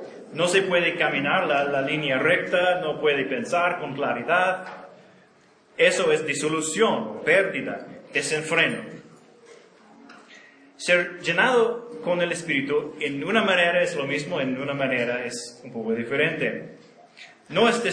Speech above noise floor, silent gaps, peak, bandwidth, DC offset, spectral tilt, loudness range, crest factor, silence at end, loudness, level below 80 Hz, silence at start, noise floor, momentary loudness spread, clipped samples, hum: 34 dB; none; -4 dBFS; 10.5 kHz; under 0.1%; -3.5 dB/octave; 4 LU; 20 dB; 0 s; -23 LUFS; -72 dBFS; 0 s; -57 dBFS; 12 LU; under 0.1%; none